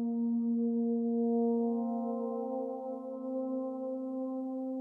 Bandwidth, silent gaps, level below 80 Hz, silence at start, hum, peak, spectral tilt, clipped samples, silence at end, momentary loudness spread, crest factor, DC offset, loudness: 1.4 kHz; none; under -90 dBFS; 0 s; none; -22 dBFS; -12.5 dB/octave; under 0.1%; 0 s; 8 LU; 12 dB; under 0.1%; -34 LUFS